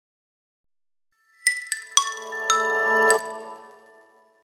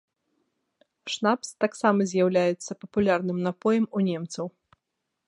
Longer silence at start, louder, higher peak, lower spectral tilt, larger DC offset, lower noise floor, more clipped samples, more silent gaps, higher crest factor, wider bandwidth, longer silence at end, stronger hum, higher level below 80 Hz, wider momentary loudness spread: first, 1.45 s vs 1.05 s; first, -21 LUFS vs -26 LUFS; first, 0 dBFS vs -6 dBFS; second, 1.5 dB/octave vs -5.5 dB/octave; neither; second, -75 dBFS vs -82 dBFS; neither; neither; first, 26 dB vs 20 dB; first, 16.5 kHz vs 11.5 kHz; about the same, 0.75 s vs 0.8 s; neither; second, -80 dBFS vs -66 dBFS; first, 15 LU vs 12 LU